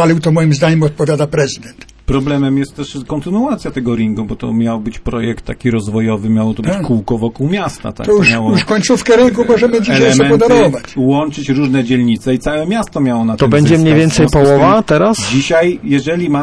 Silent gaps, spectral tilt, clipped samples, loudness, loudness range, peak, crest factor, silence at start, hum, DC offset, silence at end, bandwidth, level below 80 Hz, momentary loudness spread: none; -6 dB/octave; under 0.1%; -12 LUFS; 6 LU; 0 dBFS; 12 dB; 0 s; none; under 0.1%; 0 s; 11 kHz; -32 dBFS; 9 LU